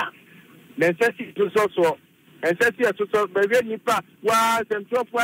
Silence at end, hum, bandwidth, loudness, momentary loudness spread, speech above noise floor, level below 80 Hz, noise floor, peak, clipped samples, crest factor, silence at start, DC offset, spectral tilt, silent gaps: 0 s; none; 16 kHz; -22 LUFS; 6 LU; 28 dB; -66 dBFS; -49 dBFS; -8 dBFS; under 0.1%; 14 dB; 0 s; under 0.1%; -4 dB/octave; none